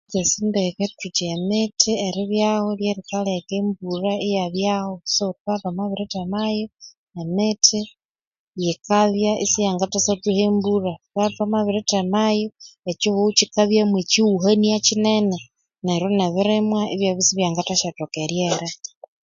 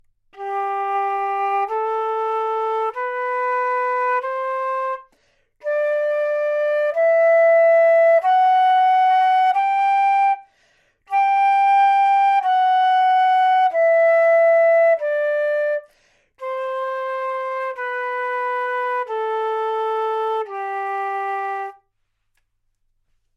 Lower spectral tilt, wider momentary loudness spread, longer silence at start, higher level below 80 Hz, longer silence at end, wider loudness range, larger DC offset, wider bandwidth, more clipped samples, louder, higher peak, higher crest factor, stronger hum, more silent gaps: first, -4 dB/octave vs -1 dB/octave; about the same, 10 LU vs 11 LU; second, 0.1 s vs 0.35 s; first, -60 dBFS vs -70 dBFS; second, 0.5 s vs 1.65 s; second, 5 LU vs 9 LU; neither; about the same, 7.6 kHz vs 7.6 kHz; neither; second, -21 LUFS vs -18 LUFS; first, 0 dBFS vs -10 dBFS; first, 22 dB vs 10 dB; neither; first, 5.40-5.45 s, 6.97-7.07 s, 8.05-8.15 s, 8.27-8.31 s, 8.39-8.53 s, 12.79-12.83 s vs none